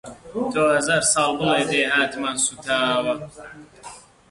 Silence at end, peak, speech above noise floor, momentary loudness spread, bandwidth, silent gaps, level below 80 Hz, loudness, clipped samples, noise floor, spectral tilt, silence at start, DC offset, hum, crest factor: 0.3 s; -6 dBFS; 22 dB; 23 LU; 11.5 kHz; none; -56 dBFS; -20 LUFS; under 0.1%; -43 dBFS; -2.5 dB/octave; 0.05 s; under 0.1%; none; 16 dB